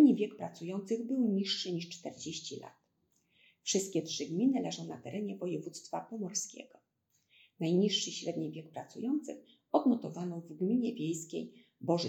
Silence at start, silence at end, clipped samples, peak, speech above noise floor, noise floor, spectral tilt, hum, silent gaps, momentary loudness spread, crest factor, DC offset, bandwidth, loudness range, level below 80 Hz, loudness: 0 s; 0 s; under 0.1%; -14 dBFS; 43 dB; -78 dBFS; -4.5 dB/octave; none; none; 13 LU; 20 dB; under 0.1%; 15 kHz; 3 LU; -88 dBFS; -35 LUFS